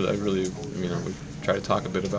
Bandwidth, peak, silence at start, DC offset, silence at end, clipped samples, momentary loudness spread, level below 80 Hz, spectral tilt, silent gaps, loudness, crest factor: 8 kHz; -8 dBFS; 0 s; under 0.1%; 0 s; under 0.1%; 6 LU; -48 dBFS; -6 dB/octave; none; -28 LUFS; 20 dB